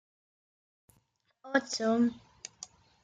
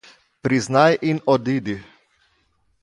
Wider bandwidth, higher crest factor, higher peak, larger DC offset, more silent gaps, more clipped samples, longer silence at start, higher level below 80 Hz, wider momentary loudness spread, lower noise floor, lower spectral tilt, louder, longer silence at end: second, 9.4 kHz vs 11.5 kHz; about the same, 22 dB vs 20 dB; second, -14 dBFS vs -2 dBFS; neither; neither; neither; first, 1.45 s vs 0.45 s; second, -76 dBFS vs -58 dBFS; first, 20 LU vs 13 LU; first, -74 dBFS vs -65 dBFS; second, -3.5 dB/octave vs -6 dB/octave; second, -30 LUFS vs -20 LUFS; second, 0.4 s vs 1 s